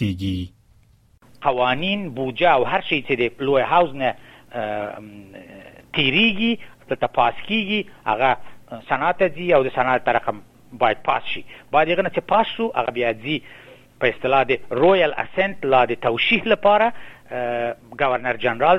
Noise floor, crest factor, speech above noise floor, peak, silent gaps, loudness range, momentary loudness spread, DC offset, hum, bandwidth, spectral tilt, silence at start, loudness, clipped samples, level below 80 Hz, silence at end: -55 dBFS; 18 dB; 35 dB; -4 dBFS; none; 3 LU; 12 LU; under 0.1%; none; 12 kHz; -6.5 dB/octave; 0 s; -20 LUFS; under 0.1%; -52 dBFS; 0 s